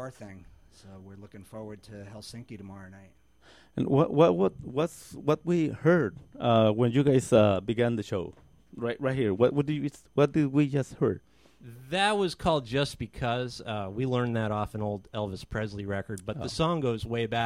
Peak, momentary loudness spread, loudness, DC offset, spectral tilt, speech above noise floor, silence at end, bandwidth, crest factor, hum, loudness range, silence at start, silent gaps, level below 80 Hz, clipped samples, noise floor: -8 dBFS; 20 LU; -28 LUFS; under 0.1%; -6.5 dB/octave; 31 dB; 0 s; 14 kHz; 20 dB; none; 7 LU; 0 s; none; -54 dBFS; under 0.1%; -58 dBFS